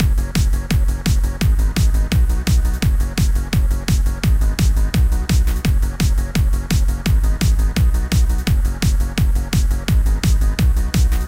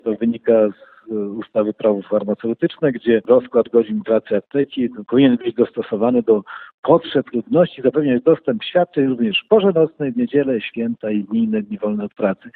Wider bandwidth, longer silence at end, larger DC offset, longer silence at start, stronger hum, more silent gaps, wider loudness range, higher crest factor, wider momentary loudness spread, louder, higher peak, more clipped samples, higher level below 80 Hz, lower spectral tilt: first, 16.5 kHz vs 4.3 kHz; about the same, 0 s vs 0.05 s; neither; about the same, 0 s vs 0.05 s; neither; second, none vs 6.74-6.83 s; about the same, 0 LU vs 2 LU; about the same, 12 dB vs 16 dB; second, 2 LU vs 8 LU; about the same, -18 LUFS vs -18 LUFS; second, -4 dBFS vs 0 dBFS; neither; first, -16 dBFS vs -60 dBFS; second, -5.5 dB/octave vs -11 dB/octave